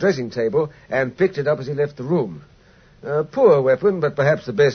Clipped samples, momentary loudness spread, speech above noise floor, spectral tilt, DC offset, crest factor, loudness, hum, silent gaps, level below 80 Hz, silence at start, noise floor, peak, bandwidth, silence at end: under 0.1%; 9 LU; 32 dB; -7 dB/octave; under 0.1%; 16 dB; -20 LUFS; none; none; -56 dBFS; 0 s; -51 dBFS; -4 dBFS; 6.6 kHz; 0 s